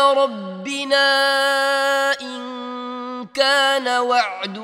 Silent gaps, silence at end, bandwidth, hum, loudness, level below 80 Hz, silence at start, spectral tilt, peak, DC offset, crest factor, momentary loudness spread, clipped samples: none; 0 s; 16 kHz; none; -18 LUFS; -74 dBFS; 0 s; -2 dB/octave; -2 dBFS; under 0.1%; 18 dB; 14 LU; under 0.1%